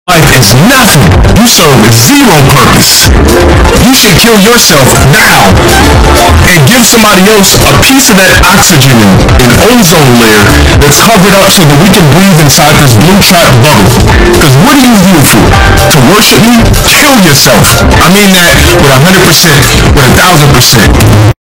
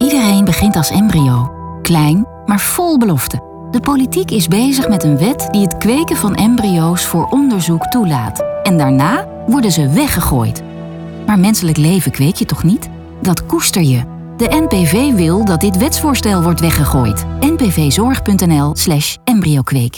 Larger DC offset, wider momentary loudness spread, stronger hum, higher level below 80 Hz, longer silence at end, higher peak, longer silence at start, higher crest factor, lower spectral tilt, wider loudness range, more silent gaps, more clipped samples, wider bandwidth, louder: first, 1% vs under 0.1%; second, 2 LU vs 6 LU; neither; first, -14 dBFS vs -32 dBFS; about the same, 0.1 s vs 0 s; about the same, 0 dBFS vs 0 dBFS; about the same, 0.05 s vs 0 s; second, 2 dB vs 12 dB; second, -4 dB/octave vs -5.5 dB/octave; about the same, 0 LU vs 1 LU; neither; first, 30% vs under 0.1%; about the same, over 20 kHz vs 19.5 kHz; first, -1 LUFS vs -12 LUFS